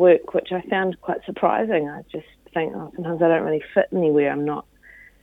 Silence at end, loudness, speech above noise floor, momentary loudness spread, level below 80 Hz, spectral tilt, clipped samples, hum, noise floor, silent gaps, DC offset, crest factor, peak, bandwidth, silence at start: 0.6 s; -22 LUFS; 28 dB; 12 LU; -60 dBFS; -8.5 dB/octave; under 0.1%; none; -49 dBFS; none; under 0.1%; 18 dB; -4 dBFS; 4 kHz; 0 s